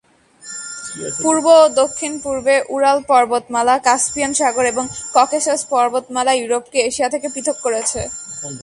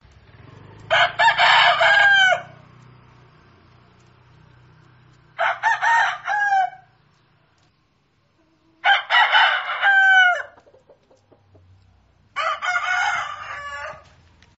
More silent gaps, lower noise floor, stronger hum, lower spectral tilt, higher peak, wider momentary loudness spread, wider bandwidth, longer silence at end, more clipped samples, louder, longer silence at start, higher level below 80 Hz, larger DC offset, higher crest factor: neither; second, -40 dBFS vs -64 dBFS; neither; first, -2 dB/octave vs 3.5 dB/octave; about the same, 0 dBFS vs -2 dBFS; second, 13 LU vs 18 LU; first, 11.5 kHz vs 8 kHz; second, 0 s vs 0.6 s; neither; about the same, -16 LUFS vs -17 LUFS; second, 0.45 s vs 0.9 s; first, -50 dBFS vs -60 dBFS; neither; about the same, 16 dB vs 20 dB